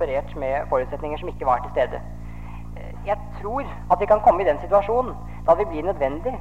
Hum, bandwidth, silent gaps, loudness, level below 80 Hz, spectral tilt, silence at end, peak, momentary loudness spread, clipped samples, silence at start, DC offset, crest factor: 50 Hz at -50 dBFS; 8.6 kHz; none; -23 LUFS; -38 dBFS; -7.5 dB/octave; 0 s; -4 dBFS; 19 LU; under 0.1%; 0 s; 1%; 18 dB